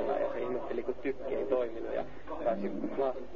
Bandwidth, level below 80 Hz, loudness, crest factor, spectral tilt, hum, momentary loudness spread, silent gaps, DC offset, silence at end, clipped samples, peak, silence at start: 7 kHz; -58 dBFS; -35 LUFS; 16 dB; -5.5 dB/octave; none; 5 LU; none; 1%; 0 s; under 0.1%; -18 dBFS; 0 s